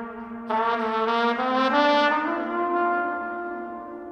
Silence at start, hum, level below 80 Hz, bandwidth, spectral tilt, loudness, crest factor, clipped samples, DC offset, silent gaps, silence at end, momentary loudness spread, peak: 0 s; none; -64 dBFS; 9 kHz; -4.5 dB/octave; -23 LUFS; 18 dB; under 0.1%; under 0.1%; none; 0 s; 15 LU; -6 dBFS